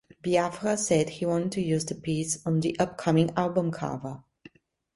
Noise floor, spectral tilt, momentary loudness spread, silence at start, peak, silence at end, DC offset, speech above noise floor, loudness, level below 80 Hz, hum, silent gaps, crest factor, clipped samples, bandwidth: -55 dBFS; -5.5 dB/octave; 8 LU; 0.25 s; -8 dBFS; 0.75 s; under 0.1%; 28 dB; -27 LUFS; -60 dBFS; none; none; 18 dB; under 0.1%; 11.5 kHz